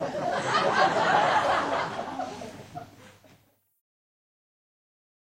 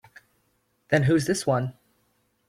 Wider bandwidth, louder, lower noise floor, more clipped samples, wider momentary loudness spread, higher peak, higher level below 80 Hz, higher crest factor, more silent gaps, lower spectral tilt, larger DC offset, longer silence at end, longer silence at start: about the same, 15.5 kHz vs 15.5 kHz; about the same, -25 LUFS vs -24 LUFS; second, -63 dBFS vs -70 dBFS; neither; first, 19 LU vs 6 LU; second, -10 dBFS vs -6 dBFS; second, -66 dBFS vs -58 dBFS; about the same, 20 dB vs 20 dB; neither; second, -4 dB/octave vs -6 dB/octave; neither; first, 2.2 s vs 0.75 s; second, 0 s vs 0.9 s